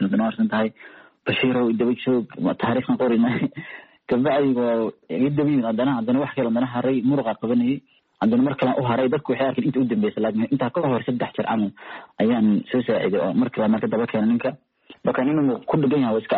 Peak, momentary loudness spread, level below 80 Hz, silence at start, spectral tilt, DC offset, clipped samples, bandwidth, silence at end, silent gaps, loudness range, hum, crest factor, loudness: -10 dBFS; 6 LU; -62 dBFS; 0 s; -6 dB/octave; under 0.1%; under 0.1%; 4.4 kHz; 0 s; none; 1 LU; none; 12 dB; -22 LUFS